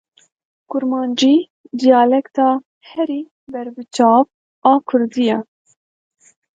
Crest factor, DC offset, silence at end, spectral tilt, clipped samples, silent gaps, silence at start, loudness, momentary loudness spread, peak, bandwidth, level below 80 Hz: 18 dB; under 0.1%; 1.15 s; -4.5 dB/octave; under 0.1%; 1.50-1.64 s, 2.66-2.81 s, 3.31-3.47 s, 4.34-4.62 s; 0.7 s; -16 LUFS; 15 LU; 0 dBFS; 9 kHz; -70 dBFS